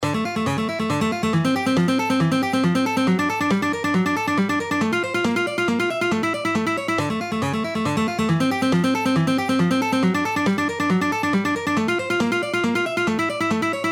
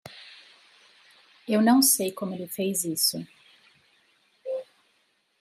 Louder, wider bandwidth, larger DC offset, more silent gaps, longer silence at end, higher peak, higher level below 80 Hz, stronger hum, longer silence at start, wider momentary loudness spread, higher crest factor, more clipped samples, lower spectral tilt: first, -21 LUFS vs -24 LUFS; first, 18 kHz vs 16 kHz; neither; neither; second, 0 s vs 0.8 s; about the same, -8 dBFS vs -10 dBFS; first, -56 dBFS vs -78 dBFS; neither; about the same, 0 s vs 0.05 s; second, 3 LU vs 26 LU; second, 12 dB vs 20 dB; neither; first, -5.5 dB/octave vs -3 dB/octave